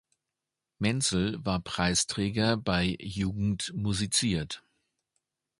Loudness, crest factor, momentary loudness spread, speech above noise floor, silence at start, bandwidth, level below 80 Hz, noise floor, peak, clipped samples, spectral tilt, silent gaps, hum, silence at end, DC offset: -29 LUFS; 20 dB; 6 LU; 59 dB; 0.8 s; 11.5 kHz; -50 dBFS; -88 dBFS; -10 dBFS; under 0.1%; -4 dB/octave; none; none; 1 s; under 0.1%